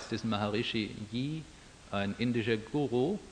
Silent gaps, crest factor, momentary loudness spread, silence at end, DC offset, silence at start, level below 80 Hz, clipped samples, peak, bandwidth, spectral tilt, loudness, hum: none; 18 dB; 9 LU; 0 s; under 0.1%; 0 s; -60 dBFS; under 0.1%; -16 dBFS; 10 kHz; -6 dB/octave; -33 LUFS; none